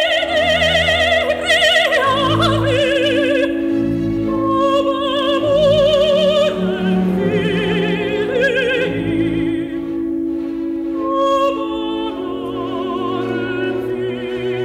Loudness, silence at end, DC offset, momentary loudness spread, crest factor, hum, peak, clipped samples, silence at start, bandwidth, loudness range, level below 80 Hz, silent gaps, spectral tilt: -16 LUFS; 0 s; under 0.1%; 9 LU; 12 dB; none; -4 dBFS; under 0.1%; 0 s; 15.5 kHz; 6 LU; -40 dBFS; none; -5.5 dB/octave